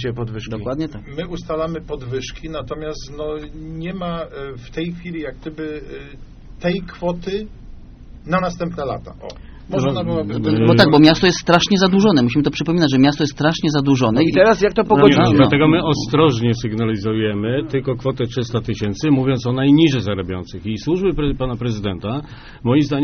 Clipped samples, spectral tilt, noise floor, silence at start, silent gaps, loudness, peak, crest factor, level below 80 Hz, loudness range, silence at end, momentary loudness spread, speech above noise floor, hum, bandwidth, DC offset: under 0.1%; -5.5 dB/octave; -37 dBFS; 0 s; none; -17 LUFS; 0 dBFS; 18 dB; -38 dBFS; 13 LU; 0 s; 16 LU; 20 dB; none; 6.6 kHz; under 0.1%